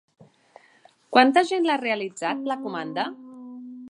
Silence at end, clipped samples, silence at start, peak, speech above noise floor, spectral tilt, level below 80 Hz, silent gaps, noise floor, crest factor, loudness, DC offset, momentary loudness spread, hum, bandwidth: 0.05 s; under 0.1%; 1.1 s; -2 dBFS; 35 dB; -4 dB/octave; -82 dBFS; none; -57 dBFS; 24 dB; -23 LUFS; under 0.1%; 23 LU; none; 11 kHz